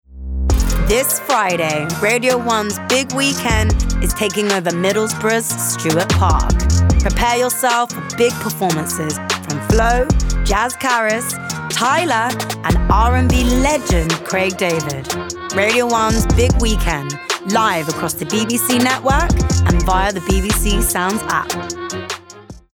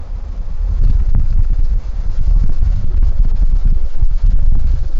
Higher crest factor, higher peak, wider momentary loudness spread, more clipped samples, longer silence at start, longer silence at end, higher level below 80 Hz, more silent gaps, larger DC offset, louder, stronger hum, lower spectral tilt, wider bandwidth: about the same, 12 dB vs 8 dB; about the same, -4 dBFS vs -2 dBFS; about the same, 6 LU vs 6 LU; neither; about the same, 0.1 s vs 0 s; first, 0.15 s vs 0 s; second, -22 dBFS vs -12 dBFS; neither; neither; first, -16 LUFS vs -19 LUFS; neither; second, -4 dB/octave vs -8.5 dB/octave; first, 20 kHz vs 1.6 kHz